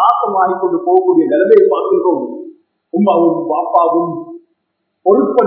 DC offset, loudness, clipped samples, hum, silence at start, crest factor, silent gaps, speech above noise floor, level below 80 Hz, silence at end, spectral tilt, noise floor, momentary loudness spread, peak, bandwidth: under 0.1%; -13 LUFS; 0.2%; none; 0 s; 12 dB; none; 58 dB; -72 dBFS; 0 s; -10.5 dB/octave; -70 dBFS; 12 LU; 0 dBFS; 3.9 kHz